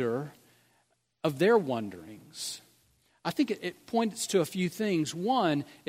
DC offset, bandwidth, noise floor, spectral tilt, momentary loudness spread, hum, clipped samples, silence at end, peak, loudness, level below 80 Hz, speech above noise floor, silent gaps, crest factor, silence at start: under 0.1%; 16 kHz; -72 dBFS; -5 dB/octave; 14 LU; none; under 0.1%; 0.15 s; -12 dBFS; -30 LUFS; -74 dBFS; 43 dB; none; 18 dB; 0 s